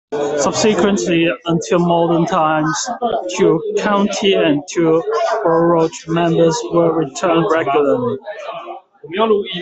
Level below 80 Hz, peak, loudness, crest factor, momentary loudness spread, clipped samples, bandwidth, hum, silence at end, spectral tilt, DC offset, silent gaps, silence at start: -54 dBFS; -2 dBFS; -15 LUFS; 14 dB; 6 LU; under 0.1%; 8.4 kHz; none; 0 s; -5 dB/octave; under 0.1%; none; 0.1 s